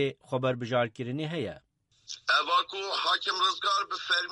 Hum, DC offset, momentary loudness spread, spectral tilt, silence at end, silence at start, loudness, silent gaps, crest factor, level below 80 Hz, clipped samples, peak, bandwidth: none; under 0.1%; 10 LU; -3.5 dB/octave; 0 s; 0 s; -28 LUFS; none; 18 dB; -72 dBFS; under 0.1%; -12 dBFS; 11.5 kHz